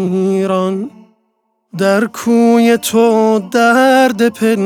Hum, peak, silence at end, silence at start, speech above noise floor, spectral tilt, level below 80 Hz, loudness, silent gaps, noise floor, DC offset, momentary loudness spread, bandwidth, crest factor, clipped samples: none; 0 dBFS; 0 s; 0 s; 53 dB; -5 dB/octave; -64 dBFS; -12 LUFS; none; -64 dBFS; under 0.1%; 8 LU; 17.5 kHz; 12 dB; under 0.1%